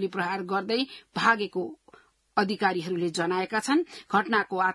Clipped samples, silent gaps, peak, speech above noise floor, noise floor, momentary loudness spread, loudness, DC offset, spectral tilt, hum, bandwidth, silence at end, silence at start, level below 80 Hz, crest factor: under 0.1%; none; -8 dBFS; 31 dB; -58 dBFS; 7 LU; -27 LUFS; under 0.1%; -4.5 dB/octave; none; 12 kHz; 0 s; 0 s; -72 dBFS; 20 dB